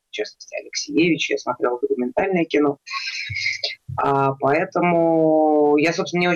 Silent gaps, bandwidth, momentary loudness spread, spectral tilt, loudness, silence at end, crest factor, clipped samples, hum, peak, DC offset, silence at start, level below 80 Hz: none; 7.8 kHz; 10 LU; -5 dB/octave; -20 LUFS; 0 s; 12 dB; under 0.1%; none; -8 dBFS; under 0.1%; 0.15 s; -60 dBFS